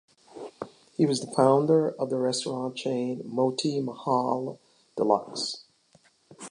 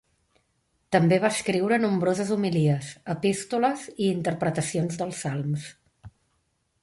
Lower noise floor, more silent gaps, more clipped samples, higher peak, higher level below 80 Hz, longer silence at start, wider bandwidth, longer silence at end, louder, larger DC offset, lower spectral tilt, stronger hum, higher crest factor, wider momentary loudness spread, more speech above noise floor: second, -63 dBFS vs -72 dBFS; neither; neither; about the same, -6 dBFS vs -6 dBFS; second, -78 dBFS vs -62 dBFS; second, 0.35 s vs 0.9 s; about the same, 11 kHz vs 11.5 kHz; second, 0 s vs 0.75 s; about the same, -27 LUFS vs -25 LUFS; neither; about the same, -5.5 dB/octave vs -6 dB/octave; neither; about the same, 20 dB vs 20 dB; first, 19 LU vs 8 LU; second, 37 dB vs 48 dB